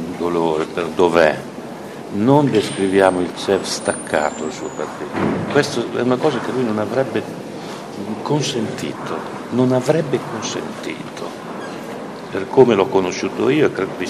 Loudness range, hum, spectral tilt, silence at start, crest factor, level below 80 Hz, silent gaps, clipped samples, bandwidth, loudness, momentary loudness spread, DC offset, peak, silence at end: 5 LU; none; -5.5 dB/octave; 0 s; 18 dB; -56 dBFS; none; under 0.1%; 13.5 kHz; -19 LUFS; 15 LU; under 0.1%; 0 dBFS; 0 s